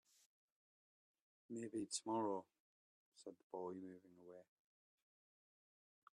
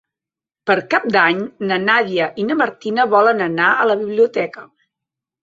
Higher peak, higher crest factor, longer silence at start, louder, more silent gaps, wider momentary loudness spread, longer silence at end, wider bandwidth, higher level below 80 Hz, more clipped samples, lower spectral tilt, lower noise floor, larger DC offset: second, -30 dBFS vs -2 dBFS; first, 24 dB vs 16 dB; first, 1.5 s vs 0.65 s; second, -48 LUFS vs -16 LUFS; first, 2.60-3.12 s, 3.43-3.50 s vs none; first, 20 LU vs 7 LU; first, 1.7 s vs 0.8 s; first, 12 kHz vs 7.6 kHz; second, under -90 dBFS vs -64 dBFS; neither; second, -4 dB/octave vs -6 dB/octave; about the same, under -90 dBFS vs -88 dBFS; neither